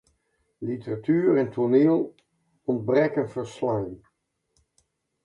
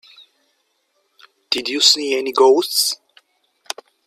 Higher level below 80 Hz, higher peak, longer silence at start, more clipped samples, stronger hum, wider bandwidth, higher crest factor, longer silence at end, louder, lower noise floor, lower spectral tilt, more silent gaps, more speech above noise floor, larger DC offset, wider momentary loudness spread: first, -64 dBFS vs -72 dBFS; second, -8 dBFS vs 0 dBFS; second, 0.6 s vs 1.5 s; neither; neither; second, 10.5 kHz vs 16 kHz; about the same, 18 dB vs 20 dB; first, 1.3 s vs 1.1 s; second, -25 LUFS vs -15 LUFS; first, -73 dBFS vs -67 dBFS; first, -8.5 dB/octave vs 0 dB/octave; neither; about the same, 49 dB vs 51 dB; neither; second, 14 LU vs 19 LU